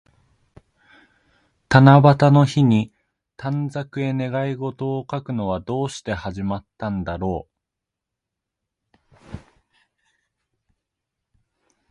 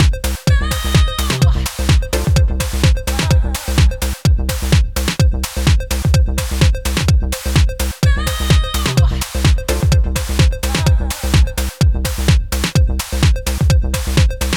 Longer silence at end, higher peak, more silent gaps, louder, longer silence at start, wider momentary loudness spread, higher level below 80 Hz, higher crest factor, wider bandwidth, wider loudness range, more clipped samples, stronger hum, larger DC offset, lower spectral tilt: first, 2.55 s vs 0 s; about the same, 0 dBFS vs 0 dBFS; neither; second, -20 LUFS vs -16 LUFS; first, 1.7 s vs 0 s; first, 19 LU vs 3 LU; second, -48 dBFS vs -18 dBFS; first, 22 dB vs 14 dB; second, 9.4 kHz vs 19 kHz; first, 15 LU vs 1 LU; neither; neither; neither; first, -7.5 dB/octave vs -5 dB/octave